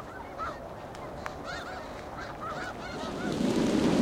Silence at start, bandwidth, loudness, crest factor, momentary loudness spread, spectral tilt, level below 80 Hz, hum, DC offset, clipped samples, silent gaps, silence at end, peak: 0 s; 16.5 kHz; -34 LUFS; 18 dB; 14 LU; -5.5 dB/octave; -52 dBFS; none; under 0.1%; under 0.1%; none; 0 s; -14 dBFS